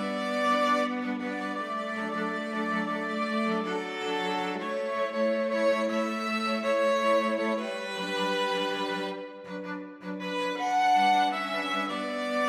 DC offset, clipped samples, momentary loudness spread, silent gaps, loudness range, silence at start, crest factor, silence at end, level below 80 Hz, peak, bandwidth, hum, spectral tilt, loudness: under 0.1%; under 0.1%; 9 LU; none; 3 LU; 0 s; 16 dB; 0 s; -84 dBFS; -12 dBFS; 15 kHz; none; -4.5 dB/octave; -28 LUFS